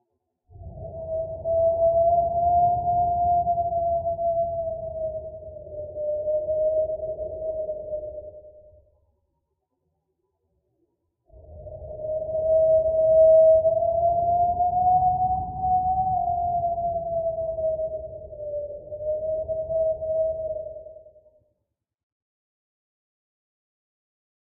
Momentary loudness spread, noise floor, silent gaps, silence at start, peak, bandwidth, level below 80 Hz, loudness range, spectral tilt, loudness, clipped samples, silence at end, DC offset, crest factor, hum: 17 LU; -81 dBFS; none; 0.55 s; -10 dBFS; 1.1 kHz; -48 dBFS; 14 LU; 4 dB/octave; -23 LUFS; under 0.1%; 3.55 s; under 0.1%; 16 dB; none